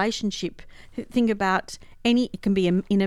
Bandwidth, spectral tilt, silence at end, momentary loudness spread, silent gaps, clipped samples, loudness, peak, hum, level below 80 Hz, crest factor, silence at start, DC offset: 12 kHz; -5.5 dB/octave; 0 s; 14 LU; none; under 0.1%; -24 LUFS; -8 dBFS; none; -50 dBFS; 16 dB; 0 s; under 0.1%